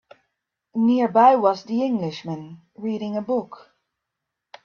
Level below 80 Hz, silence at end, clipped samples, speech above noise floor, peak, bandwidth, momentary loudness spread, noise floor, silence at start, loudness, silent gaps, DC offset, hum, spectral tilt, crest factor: -70 dBFS; 1.1 s; under 0.1%; 62 dB; -4 dBFS; 6.8 kHz; 18 LU; -83 dBFS; 0.75 s; -21 LUFS; none; under 0.1%; none; -7.5 dB/octave; 20 dB